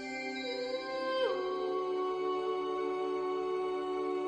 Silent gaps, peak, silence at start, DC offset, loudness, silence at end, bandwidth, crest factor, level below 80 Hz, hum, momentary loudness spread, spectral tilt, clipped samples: none; -20 dBFS; 0 s; under 0.1%; -35 LUFS; 0 s; 9 kHz; 14 dB; -74 dBFS; none; 4 LU; -4 dB/octave; under 0.1%